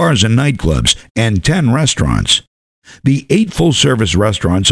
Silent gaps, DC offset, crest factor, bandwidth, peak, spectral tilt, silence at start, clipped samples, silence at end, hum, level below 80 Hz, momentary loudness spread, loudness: 1.11-1.15 s, 2.47-2.82 s; under 0.1%; 12 dB; 11 kHz; 0 dBFS; -4.5 dB/octave; 0 s; under 0.1%; 0 s; none; -28 dBFS; 3 LU; -13 LUFS